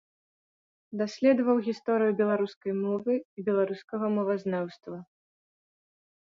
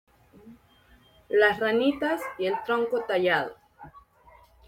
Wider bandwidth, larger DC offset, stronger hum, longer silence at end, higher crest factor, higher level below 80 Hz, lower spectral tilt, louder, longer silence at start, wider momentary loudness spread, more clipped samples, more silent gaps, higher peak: second, 7.4 kHz vs 17 kHz; neither; neither; first, 1.25 s vs 0.7 s; about the same, 18 dB vs 22 dB; second, -78 dBFS vs -64 dBFS; first, -7.5 dB/octave vs -5 dB/octave; second, -28 LUFS vs -25 LUFS; first, 0.9 s vs 0.45 s; first, 12 LU vs 7 LU; neither; first, 2.56-2.61 s, 3.25-3.37 s, 3.84-3.88 s vs none; second, -12 dBFS vs -6 dBFS